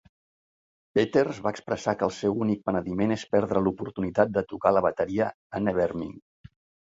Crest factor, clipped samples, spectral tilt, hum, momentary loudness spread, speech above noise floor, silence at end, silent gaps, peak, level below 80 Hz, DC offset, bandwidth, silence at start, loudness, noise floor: 22 dB; under 0.1%; -7 dB/octave; none; 6 LU; over 64 dB; 0.65 s; 5.34-5.50 s; -6 dBFS; -56 dBFS; under 0.1%; 8 kHz; 0.95 s; -27 LUFS; under -90 dBFS